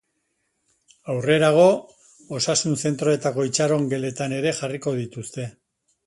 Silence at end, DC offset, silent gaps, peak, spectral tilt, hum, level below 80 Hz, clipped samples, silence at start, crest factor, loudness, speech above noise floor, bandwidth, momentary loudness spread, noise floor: 0.55 s; under 0.1%; none; -4 dBFS; -4.5 dB/octave; none; -64 dBFS; under 0.1%; 1.05 s; 18 dB; -22 LUFS; 52 dB; 11.5 kHz; 16 LU; -73 dBFS